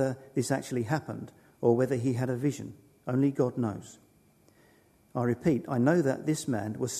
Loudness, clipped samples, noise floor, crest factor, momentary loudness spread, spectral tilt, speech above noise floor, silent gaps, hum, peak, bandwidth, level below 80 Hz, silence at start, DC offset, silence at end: -29 LUFS; under 0.1%; -63 dBFS; 20 dB; 15 LU; -6.5 dB/octave; 34 dB; none; none; -10 dBFS; 13.5 kHz; -66 dBFS; 0 s; under 0.1%; 0 s